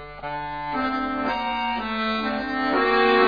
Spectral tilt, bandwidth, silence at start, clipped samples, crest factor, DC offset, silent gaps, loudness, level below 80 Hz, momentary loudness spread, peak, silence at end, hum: -6 dB/octave; 5 kHz; 0 s; under 0.1%; 18 dB; 0.3%; none; -24 LUFS; -48 dBFS; 11 LU; -6 dBFS; 0 s; none